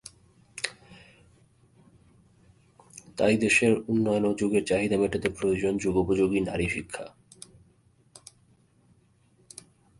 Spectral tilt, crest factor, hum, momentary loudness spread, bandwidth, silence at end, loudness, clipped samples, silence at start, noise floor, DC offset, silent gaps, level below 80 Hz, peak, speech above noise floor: -5 dB/octave; 20 dB; none; 26 LU; 11.5 kHz; 2.9 s; -26 LUFS; under 0.1%; 0.55 s; -63 dBFS; under 0.1%; none; -52 dBFS; -10 dBFS; 38 dB